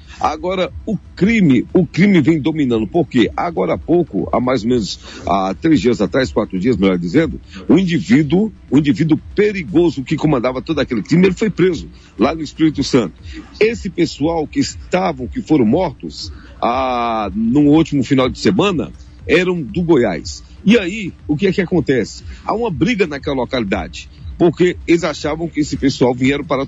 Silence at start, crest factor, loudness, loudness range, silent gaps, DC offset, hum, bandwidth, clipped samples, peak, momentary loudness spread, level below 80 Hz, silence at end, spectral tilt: 0 s; 14 dB; -16 LUFS; 3 LU; none; under 0.1%; none; 8.2 kHz; under 0.1%; -2 dBFS; 9 LU; -38 dBFS; 0 s; -6.5 dB/octave